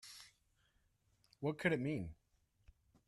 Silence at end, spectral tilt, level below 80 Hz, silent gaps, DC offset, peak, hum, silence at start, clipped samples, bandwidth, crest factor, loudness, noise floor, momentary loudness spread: 0.95 s; -6.5 dB/octave; -68 dBFS; none; under 0.1%; -20 dBFS; none; 0.05 s; under 0.1%; 13.5 kHz; 24 dB; -40 LUFS; -78 dBFS; 18 LU